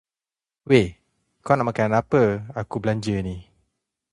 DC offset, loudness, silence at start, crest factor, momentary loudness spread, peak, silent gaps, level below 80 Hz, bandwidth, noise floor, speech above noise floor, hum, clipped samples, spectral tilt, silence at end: under 0.1%; -22 LUFS; 0.65 s; 20 dB; 12 LU; -2 dBFS; none; -48 dBFS; 11 kHz; under -90 dBFS; over 69 dB; none; under 0.1%; -7 dB/octave; 0.7 s